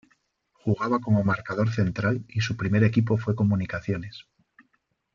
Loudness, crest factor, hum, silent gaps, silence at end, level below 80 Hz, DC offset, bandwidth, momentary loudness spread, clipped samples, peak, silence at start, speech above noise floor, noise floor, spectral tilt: -25 LUFS; 18 dB; none; none; 0.95 s; -56 dBFS; under 0.1%; 7.2 kHz; 10 LU; under 0.1%; -8 dBFS; 0.65 s; 48 dB; -72 dBFS; -7.5 dB/octave